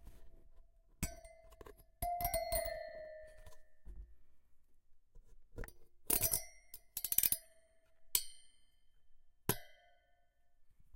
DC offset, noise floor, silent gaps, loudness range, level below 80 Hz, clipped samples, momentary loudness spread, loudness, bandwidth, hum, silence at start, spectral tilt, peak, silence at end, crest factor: under 0.1%; -71 dBFS; none; 9 LU; -56 dBFS; under 0.1%; 26 LU; -37 LUFS; 17 kHz; none; 0 s; -2 dB/octave; -10 dBFS; 0 s; 34 dB